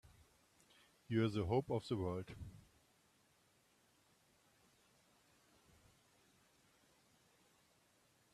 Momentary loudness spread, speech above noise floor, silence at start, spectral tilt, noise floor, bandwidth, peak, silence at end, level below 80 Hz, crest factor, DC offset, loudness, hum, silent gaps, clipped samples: 17 LU; 36 dB; 1.1 s; -7.5 dB/octave; -75 dBFS; 14 kHz; -24 dBFS; 5.75 s; -72 dBFS; 24 dB; under 0.1%; -40 LUFS; none; none; under 0.1%